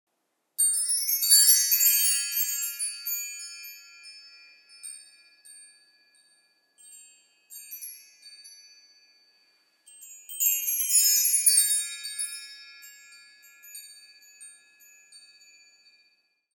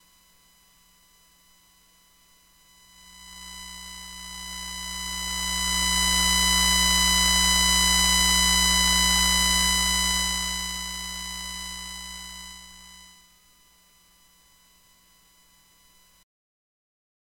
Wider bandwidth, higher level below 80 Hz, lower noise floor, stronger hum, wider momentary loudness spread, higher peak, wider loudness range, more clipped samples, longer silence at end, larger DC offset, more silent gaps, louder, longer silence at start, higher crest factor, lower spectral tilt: first, over 20 kHz vs 17 kHz; second, under -90 dBFS vs -38 dBFS; first, -77 dBFS vs -59 dBFS; neither; first, 27 LU vs 20 LU; about the same, -4 dBFS vs -4 dBFS; first, 25 LU vs 21 LU; neither; second, 1.35 s vs 4.3 s; neither; neither; about the same, -21 LUFS vs -20 LUFS; second, 0.6 s vs 3.2 s; about the same, 24 dB vs 22 dB; second, 9 dB/octave vs -0.5 dB/octave